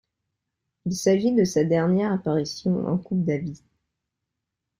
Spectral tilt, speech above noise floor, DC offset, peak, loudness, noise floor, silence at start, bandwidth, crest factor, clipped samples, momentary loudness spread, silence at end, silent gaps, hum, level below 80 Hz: -6.5 dB/octave; 61 dB; under 0.1%; -8 dBFS; -23 LUFS; -83 dBFS; 0.85 s; 16 kHz; 18 dB; under 0.1%; 9 LU; 1.25 s; none; none; -60 dBFS